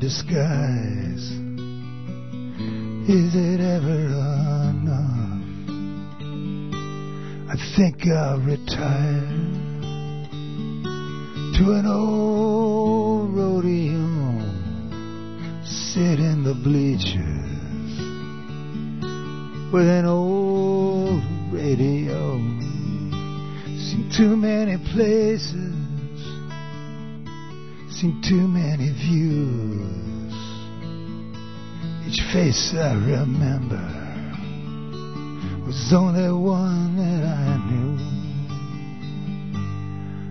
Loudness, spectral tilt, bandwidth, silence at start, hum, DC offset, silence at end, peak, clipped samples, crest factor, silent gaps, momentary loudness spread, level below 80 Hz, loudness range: -23 LUFS; -7 dB/octave; 6.4 kHz; 0 s; none; 1%; 0 s; -6 dBFS; under 0.1%; 18 dB; none; 14 LU; -42 dBFS; 5 LU